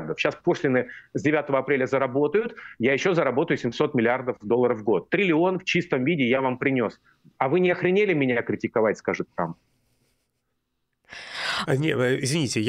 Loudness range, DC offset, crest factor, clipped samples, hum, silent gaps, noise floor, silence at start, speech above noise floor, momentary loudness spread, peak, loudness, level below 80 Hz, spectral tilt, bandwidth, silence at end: 6 LU; under 0.1%; 18 dB; under 0.1%; none; none; -76 dBFS; 0 s; 53 dB; 7 LU; -6 dBFS; -24 LUFS; -66 dBFS; -5.5 dB/octave; 14.5 kHz; 0 s